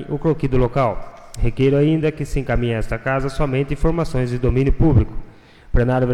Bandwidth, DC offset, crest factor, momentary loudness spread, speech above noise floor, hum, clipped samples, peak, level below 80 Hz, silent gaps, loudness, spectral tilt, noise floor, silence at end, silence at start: 11.5 kHz; under 0.1%; 14 dB; 9 LU; 24 dB; none; under 0.1%; -4 dBFS; -26 dBFS; none; -20 LUFS; -8 dB/octave; -42 dBFS; 0 s; 0 s